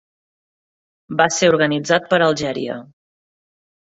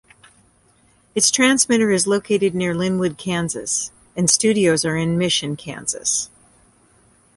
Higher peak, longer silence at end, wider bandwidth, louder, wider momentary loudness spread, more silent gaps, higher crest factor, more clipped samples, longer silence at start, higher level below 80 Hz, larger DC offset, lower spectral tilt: about the same, 0 dBFS vs -2 dBFS; about the same, 1.05 s vs 1.1 s; second, 8 kHz vs 12 kHz; about the same, -17 LUFS vs -18 LUFS; about the same, 11 LU vs 10 LU; neither; about the same, 20 dB vs 20 dB; neither; about the same, 1.1 s vs 1.15 s; about the same, -60 dBFS vs -56 dBFS; neither; about the same, -4 dB/octave vs -3.5 dB/octave